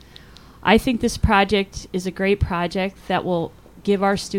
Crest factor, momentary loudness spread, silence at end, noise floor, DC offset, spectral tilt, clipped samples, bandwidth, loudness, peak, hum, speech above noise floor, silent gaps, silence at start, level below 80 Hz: 18 dB; 10 LU; 0 s; -45 dBFS; 0.1%; -5.5 dB/octave; under 0.1%; 16.5 kHz; -21 LUFS; -2 dBFS; none; 25 dB; none; 0.65 s; -34 dBFS